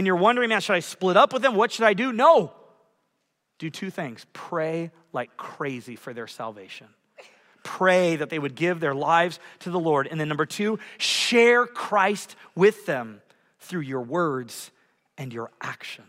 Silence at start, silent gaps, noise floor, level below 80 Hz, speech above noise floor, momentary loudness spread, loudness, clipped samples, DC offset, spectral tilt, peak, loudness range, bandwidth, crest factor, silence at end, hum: 0 s; none; -75 dBFS; -78 dBFS; 52 dB; 19 LU; -23 LUFS; under 0.1%; under 0.1%; -4.5 dB/octave; -4 dBFS; 11 LU; 16 kHz; 20 dB; 0.1 s; none